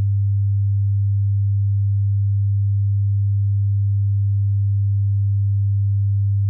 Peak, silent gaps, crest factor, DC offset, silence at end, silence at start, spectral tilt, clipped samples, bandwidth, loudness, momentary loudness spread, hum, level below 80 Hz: -14 dBFS; none; 4 dB; under 0.1%; 0 s; 0 s; -18.5 dB/octave; under 0.1%; 0.2 kHz; -20 LUFS; 0 LU; none; -52 dBFS